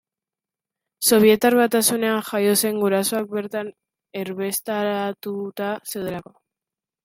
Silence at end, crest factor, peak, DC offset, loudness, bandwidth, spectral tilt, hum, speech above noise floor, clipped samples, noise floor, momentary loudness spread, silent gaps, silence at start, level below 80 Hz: 0.85 s; 18 dB; -4 dBFS; under 0.1%; -21 LUFS; 16.5 kHz; -3.5 dB/octave; none; 69 dB; under 0.1%; -90 dBFS; 15 LU; none; 1 s; -64 dBFS